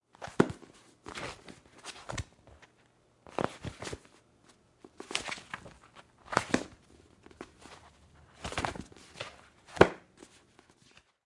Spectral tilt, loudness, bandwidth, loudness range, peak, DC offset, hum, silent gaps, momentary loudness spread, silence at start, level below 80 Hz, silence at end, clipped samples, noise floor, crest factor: -4.5 dB/octave; -34 LUFS; 11.5 kHz; 9 LU; -2 dBFS; under 0.1%; none; none; 24 LU; 0.2 s; -58 dBFS; 1.25 s; under 0.1%; -67 dBFS; 34 dB